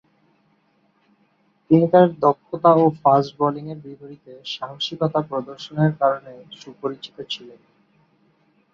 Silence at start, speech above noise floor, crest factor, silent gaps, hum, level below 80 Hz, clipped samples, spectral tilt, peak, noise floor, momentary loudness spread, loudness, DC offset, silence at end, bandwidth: 1.7 s; 43 dB; 20 dB; none; none; -66 dBFS; under 0.1%; -7.5 dB/octave; -2 dBFS; -63 dBFS; 22 LU; -20 LUFS; under 0.1%; 1.25 s; 7.2 kHz